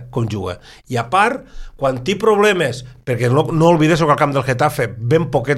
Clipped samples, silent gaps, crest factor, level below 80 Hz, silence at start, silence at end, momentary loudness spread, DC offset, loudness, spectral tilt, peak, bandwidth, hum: under 0.1%; none; 16 dB; -42 dBFS; 0 s; 0 s; 11 LU; under 0.1%; -16 LUFS; -6 dB/octave; 0 dBFS; 15.5 kHz; none